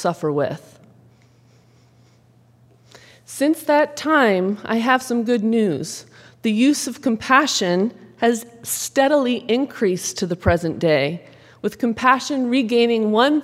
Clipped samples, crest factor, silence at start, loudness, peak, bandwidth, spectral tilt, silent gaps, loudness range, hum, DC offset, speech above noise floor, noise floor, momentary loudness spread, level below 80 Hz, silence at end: under 0.1%; 20 dB; 0 s; -19 LUFS; 0 dBFS; 16 kHz; -4.5 dB/octave; none; 6 LU; none; under 0.1%; 35 dB; -54 dBFS; 10 LU; -52 dBFS; 0 s